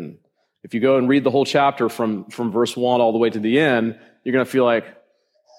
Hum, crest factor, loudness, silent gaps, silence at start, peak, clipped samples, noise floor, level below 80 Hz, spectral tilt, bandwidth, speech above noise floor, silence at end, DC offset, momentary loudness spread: none; 16 dB; -19 LUFS; none; 0 s; -4 dBFS; under 0.1%; -61 dBFS; -70 dBFS; -6 dB/octave; 15.5 kHz; 43 dB; 0.7 s; under 0.1%; 8 LU